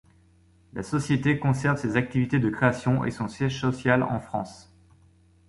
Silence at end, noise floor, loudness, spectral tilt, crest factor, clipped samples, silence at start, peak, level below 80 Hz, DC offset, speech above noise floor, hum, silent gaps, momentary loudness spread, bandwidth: 0.9 s; -59 dBFS; -25 LUFS; -7 dB/octave; 20 dB; under 0.1%; 0.75 s; -6 dBFS; -52 dBFS; under 0.1%; 34 dB; none; none; 10 LU; 11.5 kHz